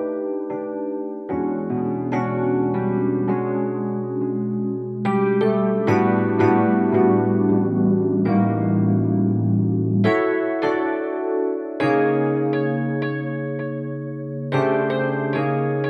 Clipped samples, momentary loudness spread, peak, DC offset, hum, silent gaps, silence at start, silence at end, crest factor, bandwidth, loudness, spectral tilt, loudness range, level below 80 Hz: under 0.1%; 9 LU; -4 dBFS; under 0.1%; none; none; 0 s; 0 s; 16 dB; 6.2 kHz; -21 LUFS; -9.5 dB/octave; 5 LU; -62 dBFS